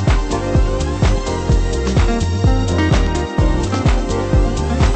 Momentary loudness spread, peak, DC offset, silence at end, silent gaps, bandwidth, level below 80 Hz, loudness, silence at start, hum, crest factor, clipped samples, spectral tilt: 3 LU; -2 dBFS; under 0.1%; 0 s; none; 8.8 kHz; -18 dBFS; -17 LUFS; 0 s; none; 12 dB; under 0.1%; -6.5 dB/octave